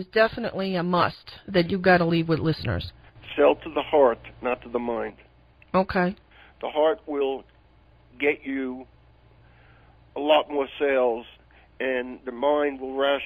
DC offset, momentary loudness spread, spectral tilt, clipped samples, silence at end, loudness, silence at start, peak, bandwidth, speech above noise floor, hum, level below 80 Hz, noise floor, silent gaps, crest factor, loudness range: under 0.1%; 13 LU; -8.5 dB/octave; under 0.1%; 0 s; -25 LUFS; 0 s; -6 dBFS; 13 kHz; 32 dB; none; -52 dBFS; -56 dBFS; none; 20 dB; 6 LU